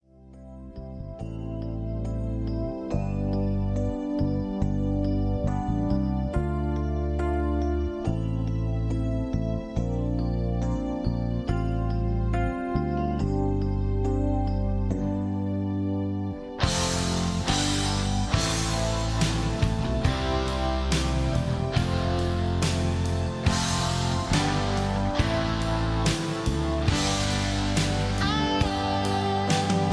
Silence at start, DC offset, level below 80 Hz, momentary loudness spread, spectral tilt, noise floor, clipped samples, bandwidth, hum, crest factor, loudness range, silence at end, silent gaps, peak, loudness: 0.2 s; under 0.1%; -32 dBFS; 5 LU; -5.5 dB/octave; -47 dBFS; under 0.1%; 11 kHz; none; 16 dB; 3 LU; 0 s; none; -10 dBFS; -27 LUFS